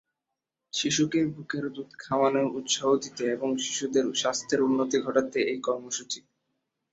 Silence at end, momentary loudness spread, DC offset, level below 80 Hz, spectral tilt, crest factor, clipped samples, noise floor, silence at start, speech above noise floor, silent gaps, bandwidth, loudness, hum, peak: 0.75 s; 8 LU; under 0.1%; -70 dBFS; -3.5 dB/octave; 20 dB; under 0.1%; -86 dBFS; 0.75 s; 59 dB; none; 8.2 kHz; -27 LUFS; none; -8 dBFS